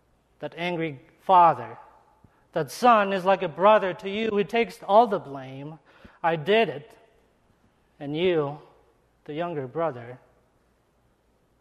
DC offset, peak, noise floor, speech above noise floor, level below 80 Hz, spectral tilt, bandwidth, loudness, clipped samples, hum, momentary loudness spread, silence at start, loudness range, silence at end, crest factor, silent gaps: under 0.1%; -6 dBFS; -66 dBFS; 42 dB; -66 dBFS; -6 dB/octave; 13 kHz; -24 LUFS; under 0.1%; none; 20 LU; 0.4 s; 9 LU; 1.45 s; 20 dB; none